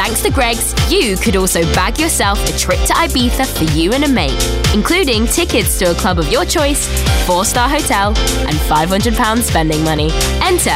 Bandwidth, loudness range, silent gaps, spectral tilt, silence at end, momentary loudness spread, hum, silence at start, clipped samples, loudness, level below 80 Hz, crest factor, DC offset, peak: 16.5 kHz; 0 LU; none; -3.5 dB/octave; 0 s; 2 LU; none; 0 s; under 0.1%; -13 LUFS; -20 dBFS; 12 dB; under 0.1%; -2 dBFS